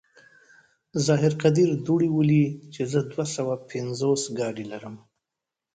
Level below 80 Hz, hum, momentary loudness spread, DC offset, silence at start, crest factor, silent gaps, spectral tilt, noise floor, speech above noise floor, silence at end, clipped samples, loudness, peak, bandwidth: -62 dBFS; none; 12 LU; under 0.1%; 0.95 s; 18 dB; none; -6.5 dB/octave; -87 dBFS; 63 dB; 0.8 s; under 0.1%; -24 LUFS; -8 dBFS; 9.4 kHz